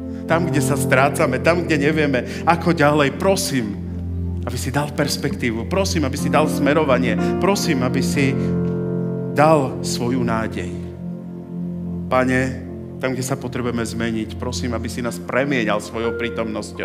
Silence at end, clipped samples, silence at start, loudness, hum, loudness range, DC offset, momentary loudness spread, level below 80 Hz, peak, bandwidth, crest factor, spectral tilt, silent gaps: 0 s; under 0.1%; 0 s; -20 LUFS; none; 6 LU; under 0.1%; 11 LU; -48 dBFS; 0 dBFS; 16 kHz; 20 dB; -5.5 dB/octave; none